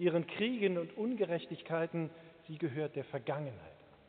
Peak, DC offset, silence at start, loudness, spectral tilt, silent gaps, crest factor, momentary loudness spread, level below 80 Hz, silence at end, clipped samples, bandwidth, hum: -18 dBFS; under 0.1%; 0 s; -37 LUFS; -5.5 dB/octave; none; 18 dB; 14 LU; -78 dBFS; 0.25 s; under 0.1%; 4.5 kHz; none